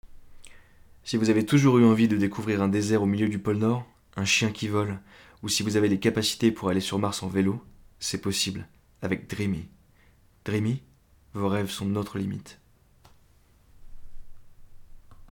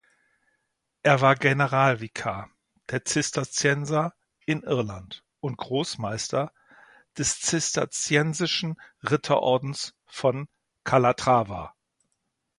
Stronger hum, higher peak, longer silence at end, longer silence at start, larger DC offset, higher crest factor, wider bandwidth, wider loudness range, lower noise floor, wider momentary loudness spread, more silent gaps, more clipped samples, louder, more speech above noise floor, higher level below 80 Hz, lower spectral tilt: neither; second, -8 dBFS vs -4 dBFS; second, 0.05 s vs 0.9 s; second, 0.05 s vs 1.05 s; neither; second, 18 dB vs 24 dB; first, 18.5 kHz vs 11.5 kHz; first, 10 LU vs 5 LU; second, -59 dBFS vs -78 dBFS; about the same, 15 LU vs 14 LU; neither; neither; about the same, -26 LUFS vs -25 LUFS; second, 34 dB vs 53 dB; about the same, -54 dBFS vs -58 dBFS; about the same, -5 dB/octave vs -4 dB/octave